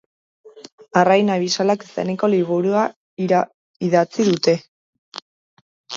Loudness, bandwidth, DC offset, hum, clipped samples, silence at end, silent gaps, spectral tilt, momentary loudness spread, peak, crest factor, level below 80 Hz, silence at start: -19 LUFS; 7.8 kHz; under 0.1%; none; under 0.1%; 0 s; 0.72-0.78 s, 2.96-3.17 s, 3.54-3.80 s, 4.68-5.12 s, 5.22-5.84 s; -5.5 dB/octave; 13 LU; 0 dBFS; 20 dB; -68 dBFS; 0.45 s